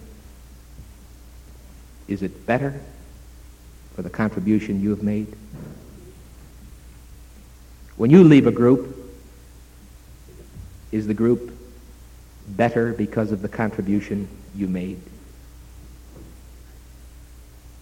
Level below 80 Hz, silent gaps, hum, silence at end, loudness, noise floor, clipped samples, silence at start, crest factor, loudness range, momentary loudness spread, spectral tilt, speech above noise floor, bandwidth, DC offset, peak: -44 dBFS; none; none; 0 s; -20 LUFS; -45 dBFS; under 0.1%; 0 s; 22 dB; 12 LU; 28 LU; -8.5 dB/octave; 26 dB; 16.5 kHz; under 0.1%; -2 dBFS